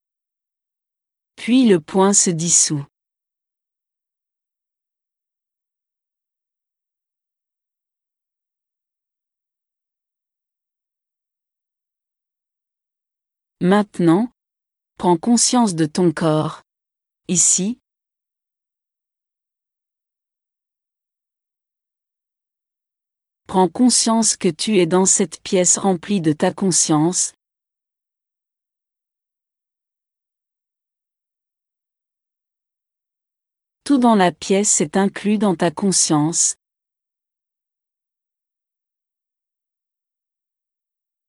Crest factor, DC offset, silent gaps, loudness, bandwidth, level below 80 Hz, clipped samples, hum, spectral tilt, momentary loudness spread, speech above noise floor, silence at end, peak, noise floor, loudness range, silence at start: 20 dB; under 0.1%; none; -16 LUFS; 12 kHz; -66 dBFS; under 0.1%; none; -4 dB/octave; 8 LU; 71 dB; 4.75 s; -2 dBFS; -87 dBFS; 8 LU; 1.4 s